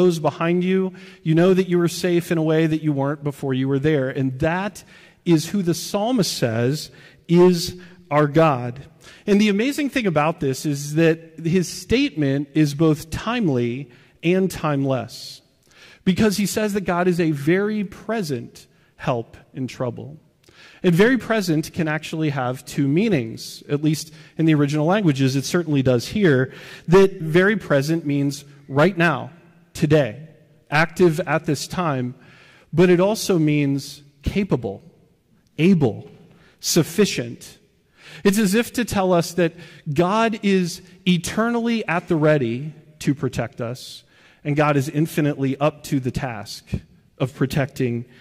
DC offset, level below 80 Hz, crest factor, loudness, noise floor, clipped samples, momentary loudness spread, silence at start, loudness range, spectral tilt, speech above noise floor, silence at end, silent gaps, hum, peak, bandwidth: under 0.1%; -48 dBFS; 14 dB; -21 LUFS; -59 dBFS; under 0.1%; 13 LU; 0 s; 4 LU; -6 dB/octave; 39 dB; 0.15 s; none; none; -6 dBFS; 16 kHz